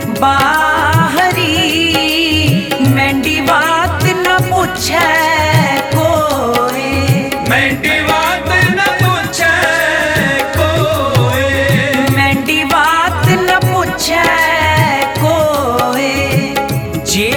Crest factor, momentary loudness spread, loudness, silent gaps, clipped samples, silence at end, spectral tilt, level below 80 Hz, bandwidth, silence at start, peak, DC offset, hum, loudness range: 12 dB; 3 LU; -11 LUFS; none; under 0.1%; 0 s; -4.5 dB/octave; -34 dBFS; 19.5 kHz; 0 s; 0 dBFS; under 0.1%; none; 1 LU